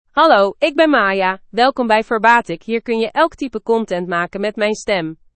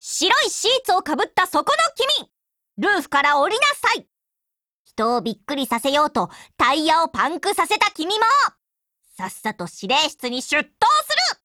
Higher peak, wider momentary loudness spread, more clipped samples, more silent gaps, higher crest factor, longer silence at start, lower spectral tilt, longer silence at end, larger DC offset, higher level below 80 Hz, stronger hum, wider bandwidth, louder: about the same, 0 dBFS vs -2 dBFS; about the same, 8 LU vs 10 LU; neither; second, none vs 4.71-4.85 s; about the same, 16 dB vs 18 dB; about the same, 0.15 s vs 0.05 s; first, -4.5 dB/octave vs -1.5 dB/octave; about the same, 0.2 s vs 0.1 s; neither; first, -52 dBFS vs -60 dBFS; neither; second, 8.8 kHz vs 19 kHz; first, -16 LUFS vs -19 LUFS